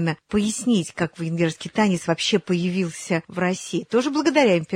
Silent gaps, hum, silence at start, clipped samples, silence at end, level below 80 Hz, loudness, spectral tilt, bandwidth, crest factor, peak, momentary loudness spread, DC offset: none; none; 0 s; under 0.1%; 0 s; -58 dBFS; -22 LUFS; -5 dB/octave; 13.5 kHz; 16 dB; -6 dBFS; 7 LU; under 0.1%